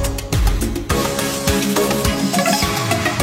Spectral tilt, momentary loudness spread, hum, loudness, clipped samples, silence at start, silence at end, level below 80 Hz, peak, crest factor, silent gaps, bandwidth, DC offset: -4 dB/octave; 4 LU; none; -18 LUFS; under 0.1%; 0 s; 0 s; -26 dBFS; -2 dBFS; 16 dB; none; 16.5 kHz; under 0.1%